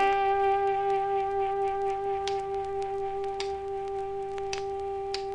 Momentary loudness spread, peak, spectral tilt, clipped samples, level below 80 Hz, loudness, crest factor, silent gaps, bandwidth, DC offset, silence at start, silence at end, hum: 8 LU; -14 dBFS; -4 dB/octave; under 0.1%; -54 dBFS; -30 LUFS; 16 dB; none; 10 kHz; under 0.1%; 0 s; 0 s; 50 Hz at -60 dBFS